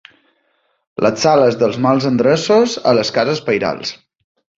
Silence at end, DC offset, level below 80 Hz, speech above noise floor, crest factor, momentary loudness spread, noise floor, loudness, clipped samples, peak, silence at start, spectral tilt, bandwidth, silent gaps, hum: 0.65 s; under 0.1%; -54 dBFS; 49 dB; 14 dB; 8 LU; -63 dBFS; -15 LUFS; under 0.1%; 0 dBFS; 1 s; -5 dB/octave; 7.8 kHz; none; none